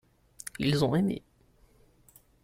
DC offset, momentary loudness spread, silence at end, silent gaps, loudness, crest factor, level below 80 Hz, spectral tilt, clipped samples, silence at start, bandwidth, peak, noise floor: under 0.1%; 17 LU; 1.25 s; none; -29 LUFS; 18 dB; -58 dBFS; -6 dB/octave; under 0.1%; 0.6 s; 16 kHz; -14 dBFS; -63 dBFS